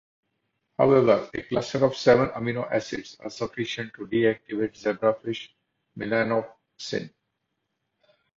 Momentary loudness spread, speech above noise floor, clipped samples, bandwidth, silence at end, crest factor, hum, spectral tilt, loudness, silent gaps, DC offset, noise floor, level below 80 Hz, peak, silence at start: 16 LU; 54 dB; under 0.1%; 7.6 kHz; 1.3 s; 22 dB; none; -6 dB/octave; -25 LUFS; none; under 0.1%; -79 dBFS; -60 dBFS; -6 dBFS; 0.8 s